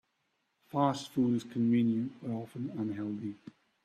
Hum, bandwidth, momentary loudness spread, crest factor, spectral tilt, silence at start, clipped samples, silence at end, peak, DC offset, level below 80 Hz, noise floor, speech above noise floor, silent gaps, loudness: none; 12.5 kHz; 11 LU; 18 dB; -7.5 dB/octave; 0.75 s; under 0.1%; 0.35 s; -14 dBFS; under 0.1%; -74 dBFS; -79 dBFS; 47 dB; none; -33 LUFS